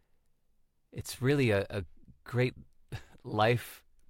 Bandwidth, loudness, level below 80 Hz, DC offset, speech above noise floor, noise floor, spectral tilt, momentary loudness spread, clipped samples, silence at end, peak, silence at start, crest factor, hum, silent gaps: 16.5 kHz; -31 LUFS; -60 dBFS; under 0.1%; 39 dB; -69 dBFS; -6 dB/octave; 19 LU; under 0.1%; 0.3 s; -14 dBFS; 0.95 s; 20 dB; none; none